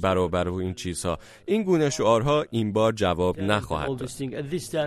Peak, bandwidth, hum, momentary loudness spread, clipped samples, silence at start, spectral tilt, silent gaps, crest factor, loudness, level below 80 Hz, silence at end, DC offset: -6 dBFS; 13.5 kHz; none; 9 LU; under 0.1%; 0 s; -5.5 dB/octave; none; 18 dB; -25 LUFS; -48 dBFS; 0 s; under 0.1%